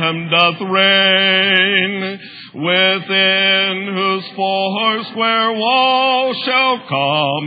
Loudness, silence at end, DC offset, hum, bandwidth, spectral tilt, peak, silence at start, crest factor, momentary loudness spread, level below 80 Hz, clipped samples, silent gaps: -13 LUFS; 0 s; under 0.1%; none; 6 kHz; -6.5 dB/octave; 0 dBFS; 0 s; 16 dB; 8 LU; -78 dBFS; under 0.1%; none